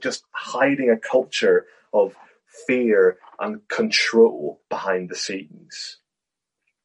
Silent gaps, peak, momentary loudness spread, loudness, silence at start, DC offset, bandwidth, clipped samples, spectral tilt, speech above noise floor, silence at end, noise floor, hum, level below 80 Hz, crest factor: none; -4 dBFS; 16 LU; -21 LUFS; 0 s; under 0.1%; 10 kHz; under 0.1%; -3.5 dB/octave; 64 dB; 0.9 s; -85 dBFS; none; -74 dBFS; 18 dB